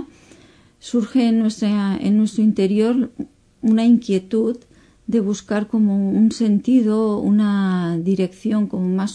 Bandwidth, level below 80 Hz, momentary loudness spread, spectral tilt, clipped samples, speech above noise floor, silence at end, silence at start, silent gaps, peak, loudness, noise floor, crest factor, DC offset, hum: 10 kHz; -56 dBFS; 8 LU; -7.5 dB/octave; under 0.1%; 32 dB; 0 s; 0 s; none; -6 dBFS; -19 LUFS; -50 dBFS; 12 dB; under 0.1%; none